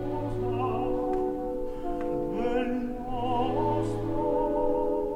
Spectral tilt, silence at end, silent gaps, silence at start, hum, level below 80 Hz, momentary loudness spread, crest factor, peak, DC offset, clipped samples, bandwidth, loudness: -8 dB/octave; 0 s; none; 0 s; none; -40 dBFS; 6 LU; 14 dB; -14 dBFS; under 0.1%; under 0.1%; 12 kHz; -29 LUFS